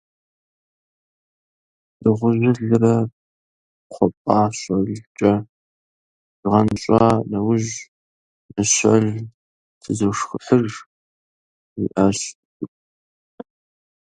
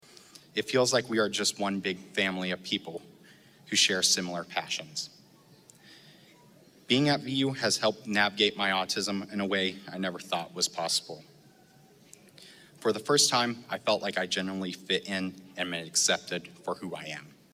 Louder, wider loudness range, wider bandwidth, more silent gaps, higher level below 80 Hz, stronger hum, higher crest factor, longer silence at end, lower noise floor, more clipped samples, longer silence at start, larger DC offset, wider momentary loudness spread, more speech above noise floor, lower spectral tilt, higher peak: first, -19 LUFS vs -28 LUFS; about the same, 4 LU vs 4 LU; second, 11 kHz vs 16 kHz; first, 3.13-3.90 s, 4.17-4.25 s, 5.07-5.15 s, 5.49-6.43 s, 7.88-8.49 s, 9.34-9.81 s, 10.86-11.76 s, 12.35-12.60 s vs none; first, -50 dBFS vs -76 dBFS; neither; about the same, 20 dB vs 22 dB; first, 1.35 s vs 0.25 s; first, under -90 dBFS vs -58 dBFS; neither; first, 2 s vs 0.55 s; neither; first, 16 LU vs 13 LU; first, over 72 dB vs 29 dB; first, -5.5 dB/octave vs -2.5 dB/octave; first, 0 dBFS vs -8 dBFS